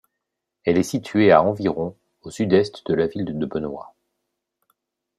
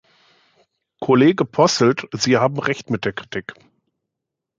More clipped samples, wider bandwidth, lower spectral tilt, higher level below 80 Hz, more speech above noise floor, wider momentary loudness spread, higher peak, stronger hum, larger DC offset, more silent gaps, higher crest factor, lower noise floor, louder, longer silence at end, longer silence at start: neither; first, 13.5 kHz vs 9.2 kHz; first, -6.5 dB/octave vs -5 dB/octave; about the same, -58 dBFS vs -60 dBFS; about the same, 61 dB vs 64 dB; about the same, 15 LU vs 15 LU; about the same, -2 dBFS vs -2 dBFS; neither; neither; neither; about the same, 20 dB vs 18 dB; about the same, -81 dBFS vs -82 dBFS; second, -21 LUFS vs -18 LUFS; first, 1.35 s vs 1.05 s; second, 0.65 s vs 1 s